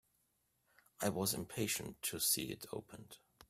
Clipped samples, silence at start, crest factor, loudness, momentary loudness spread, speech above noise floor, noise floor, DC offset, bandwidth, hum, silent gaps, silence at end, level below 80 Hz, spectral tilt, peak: under 0.1%; 1 s; 22 dB; -38 LUFS; 19 LU; 40 dB; -80 dBFS; under 0.1%; 16 kHz; none; none; 0.05 s; -72 dBFS; -3 dB/octave; -20 dBFS